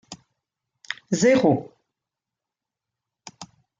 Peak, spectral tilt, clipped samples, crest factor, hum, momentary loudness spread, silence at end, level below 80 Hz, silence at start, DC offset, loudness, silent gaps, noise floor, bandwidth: -6 dBFS; -5 dB/octave; under 0.1%; 20 dB; none; 26 LU; 0.35 s; -66 dBFS; 0.1 s; under 0.1%; -20 LUFS; none; -87 dBFS; 9.4 kHz